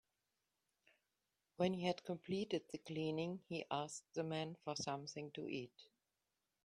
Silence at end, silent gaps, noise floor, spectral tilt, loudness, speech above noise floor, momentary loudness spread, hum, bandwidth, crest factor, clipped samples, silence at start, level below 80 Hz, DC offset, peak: 0.8 s; none; -90 dBFS; -5 dB/octave; -44 LUFS; 46 dB; 7 LU; none; 12.5 kHz; 22 dB; under 0.1%; 1.6 s; -82 dBFS; under 0.1%; -24 dBFS